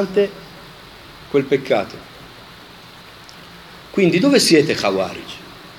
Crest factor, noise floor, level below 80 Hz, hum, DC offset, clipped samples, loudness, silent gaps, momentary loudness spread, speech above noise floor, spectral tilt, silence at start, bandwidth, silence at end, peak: 20 dB; -41 dBFS; -54 dBFS; none; under 0.1%; under 0.1%; -17 LUFS; none; 26 LU; 24 dB; -4.5 dB/octave; 0 s; 17.5 kHz; 0 s; 0 dBFS